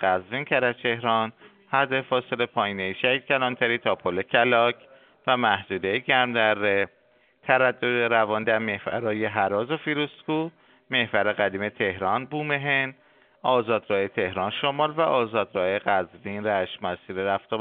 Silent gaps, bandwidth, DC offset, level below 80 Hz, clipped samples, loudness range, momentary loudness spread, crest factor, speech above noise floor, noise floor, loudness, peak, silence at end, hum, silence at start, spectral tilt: none; 4.6 kHz; under 0.1%; -68 dBFS; under 0.1%; 3 LU; 7 LU; 22 dB; 36 dB; -61 dBFS; -24 LUFS; -2 dBFS; 0 s; none; 0 s; -2 dB/octave